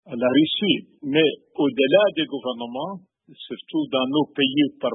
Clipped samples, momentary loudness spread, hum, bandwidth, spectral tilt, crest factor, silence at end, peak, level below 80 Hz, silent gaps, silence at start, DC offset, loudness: under 0.1%; 14 LU; none; 4.1 kHz; -10 dB/octave; 18 dB; 0 s; -4 dBFS; -72 dBFS; none; 0.05 s; under 0.1%; -22 LUFS